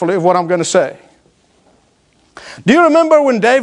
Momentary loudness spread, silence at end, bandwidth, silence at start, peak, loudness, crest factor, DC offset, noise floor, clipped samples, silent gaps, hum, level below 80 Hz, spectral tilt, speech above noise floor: 11 LU; 0 s; 10.5 kHz; 0 s; 0 dBFS; -12 LUFS; 14 dB; under 0.1%; -54 dBFS; under 0.1%; none; none; -60 dBFS; -5 dB/octave; 43 dB